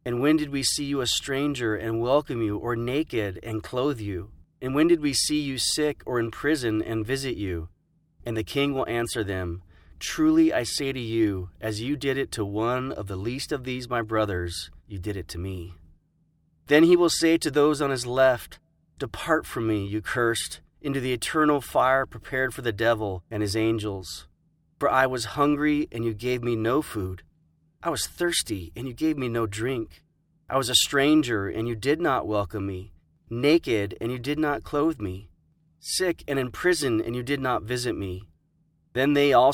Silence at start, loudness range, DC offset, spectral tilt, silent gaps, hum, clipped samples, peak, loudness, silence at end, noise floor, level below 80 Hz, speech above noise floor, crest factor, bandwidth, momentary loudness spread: 0.05 s; 5 LU; under 0.1%; -4.5 dB/octave; none; none; under 0.1%; -6 dBFS; -25 LUFS; 0 s; -67 dBFS; -50 dBFS; 42 dB; 20 dB; 17 kHz; 13 LU